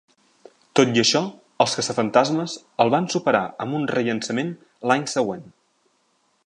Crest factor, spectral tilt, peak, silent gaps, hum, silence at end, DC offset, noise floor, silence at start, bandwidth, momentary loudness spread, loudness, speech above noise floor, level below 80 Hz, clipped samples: 22 dB; -4 dB/octave; -2 dBFS; none; none; 1 s; under 0.1%; -66 dBFS; 0.75 s; 11 kHz; 9 LU; -22 LUFS; 45 dB; -68 dBFS; under 0.1%